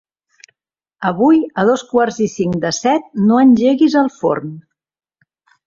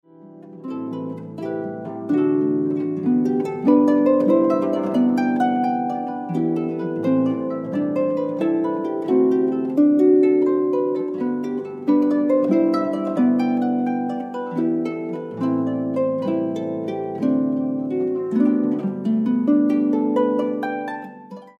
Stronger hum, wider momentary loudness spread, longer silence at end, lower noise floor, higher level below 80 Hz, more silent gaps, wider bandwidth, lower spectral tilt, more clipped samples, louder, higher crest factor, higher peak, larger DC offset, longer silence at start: neither; about the same, 9 LU vs 11 LU; first, 1.05 s vs 0.1 s; first, -78 dBFS vs -43 dBFS; first, -56 dBFS vs -74 dBFS; neither; first, 7.6 kHz vs 6.2 kHz; second, -6 dB/octave vs -9 dB/octave; neither; first, -14 LUFS vs -21 LUFS; about the same, 14 dB vs 16 dB; about the same, -2 dBFS vs -4 dBFS; neither; first, 1 s vs 0.2 s